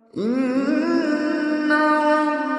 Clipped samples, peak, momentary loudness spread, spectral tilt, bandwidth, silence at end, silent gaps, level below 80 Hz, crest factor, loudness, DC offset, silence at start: under 0.1%; -6 dBFS; 5 LU; -5.5 dB/octave; 10.5 kHz; 0 s; none; -74 dBFS; 14 dB; -20 LUFS; under 0.1%; 0.15 s